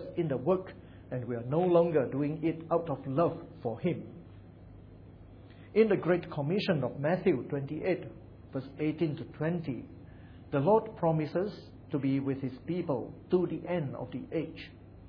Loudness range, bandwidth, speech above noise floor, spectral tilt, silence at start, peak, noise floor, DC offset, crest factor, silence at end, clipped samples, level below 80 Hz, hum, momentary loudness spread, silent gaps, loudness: 4 LU; 5.4 kHz; 20 dB; -10 dB/octave; 0 s; -12 dBFS; -51 dBFS; under 0.1%; 20 dB; 0 s; under 0.1%; -60 dBFS; none; 21 LU; none; -32 LUFS